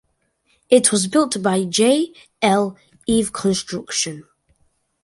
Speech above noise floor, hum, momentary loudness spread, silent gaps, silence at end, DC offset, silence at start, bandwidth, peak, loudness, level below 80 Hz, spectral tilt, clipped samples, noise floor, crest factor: 47 dB; none; 11 LU; none; 0.8 s; under 0.1%; 0.7 s; 12 kHz; 0 dBFS; -19 LUFS; -52 dBFS; -3.5 dB/octave; under 0.1%; -66 dBFS; 20 dB